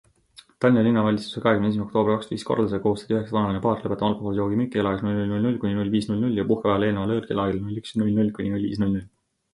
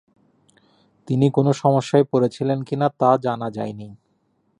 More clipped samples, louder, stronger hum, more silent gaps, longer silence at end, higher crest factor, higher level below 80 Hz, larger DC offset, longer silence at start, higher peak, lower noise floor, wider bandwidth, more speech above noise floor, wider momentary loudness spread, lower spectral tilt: neither; second, -24 LUFS vs -20 LUFS; neither; neither; second, 0.45 s vs 0.65 s; about the same, 18 dB vs 18 dB; first, -50 dBFS vs -62 dBFS; neither; second, 0.6 s vs 1.1 s; second, -6 dBFS vs -2 dBFS; second, -53 dBFS vs -66 dBFS; about the same, 11.5 kHz vs 10.5 kHz; second, 30 dB vs 47 dB; second, 5 LU vs 12 LU; about the same, -8 dB/octave vs -7.5 dB/octave